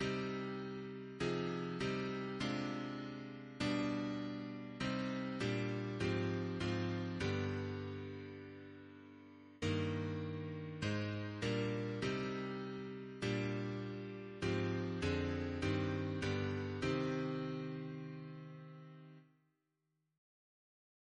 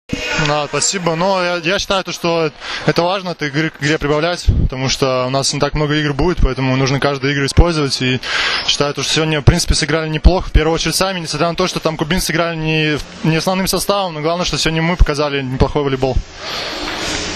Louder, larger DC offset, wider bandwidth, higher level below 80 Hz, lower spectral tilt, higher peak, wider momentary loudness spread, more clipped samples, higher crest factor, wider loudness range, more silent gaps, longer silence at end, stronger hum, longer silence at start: second, -41 LUFS vs -16 LUFS; neither; second, 10.5 kHz vs 14 kHz; second, -64 dBFS vs -24 dBFS; first, -6.5 dB/octave vs -4.5 dB/octave; second, -26 dBFS vs 0 dBFS; first, 13 LU vs 4 LU; second, under 0.1% vs 0.2%; about the same, 16 dB vs 16 dB; about the same, 4 LU vs 2 LU; neither; first, 1.95 s vs 0 s; neither; about the same, 0 s vs 0.1 s